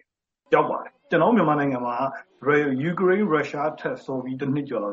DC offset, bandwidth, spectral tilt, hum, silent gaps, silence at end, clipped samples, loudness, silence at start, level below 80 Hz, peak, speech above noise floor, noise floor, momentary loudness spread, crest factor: under 0.1%; 7.4 kHz; -5.5 dB/octave; none; none; 0 s; under 0.1%; -23 LUFS; 0.5 s; -68 dBFS; -6 dBFS; 45 dB; -68 dBFS; 10 LU; 18 dB